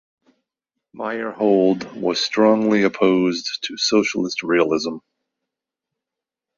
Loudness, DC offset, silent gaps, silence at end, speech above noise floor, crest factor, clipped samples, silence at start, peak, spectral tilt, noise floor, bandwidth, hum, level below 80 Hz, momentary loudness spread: -19 LUFS; under 0.1%; none; 1.6 s; 67 dB; 18 dB; under 0.1%; 0.95 s; -2 dBFS; -4.5 dB/octave; -86 dBFS; 7.2 kHz; none; -64 dBFS; 10 LU